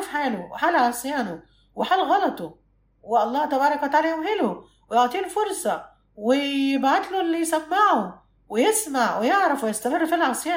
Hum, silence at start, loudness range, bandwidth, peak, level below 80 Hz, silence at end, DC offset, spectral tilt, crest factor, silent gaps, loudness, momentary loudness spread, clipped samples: none; 0 s; 2 LU; 16.5 kHz; -6 dBFS; -62 dBFS; 0 s; under 0.1%; -3 dB/octave; 16 dB; none; -23 LUFS; 9 LU; under 0.1%